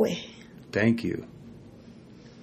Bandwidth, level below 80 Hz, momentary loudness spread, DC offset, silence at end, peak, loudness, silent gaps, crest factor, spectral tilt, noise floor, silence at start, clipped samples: 14 kHz; -60 dBFS; 24 LU; under 0.1%; 0 s; -10 dBFS; -28 LUFS; none; 20 dB; -6.5 dB/octave; -49 dBFS; 0 s; under 0.1%